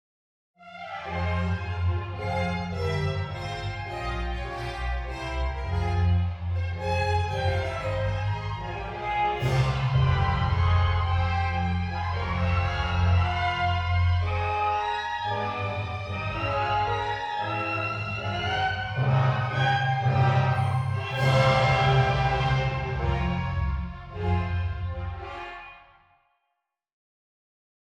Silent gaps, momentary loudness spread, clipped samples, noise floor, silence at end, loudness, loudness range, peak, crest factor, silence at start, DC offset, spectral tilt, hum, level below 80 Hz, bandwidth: none; 9 LU; under 0.1%; -80 dBFS; 2.15 s; -27 LUFS; 7 LU; -8 dBFS; 18 dB; 0.6 s; under 0.1%; -6.5 dB/octave; none; -38 dBFS; 9.2 kHz